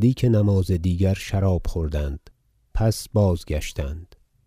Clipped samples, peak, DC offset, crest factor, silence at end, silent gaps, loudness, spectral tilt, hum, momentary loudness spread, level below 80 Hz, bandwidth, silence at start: under 0.1%; -8 dBFS; under 0.1%; 14 dB; 0.4 s; none; -23 LUFS; -7 dB/octave; none; 12 LU; -32 dBFS; 15.5 kHz; 0 s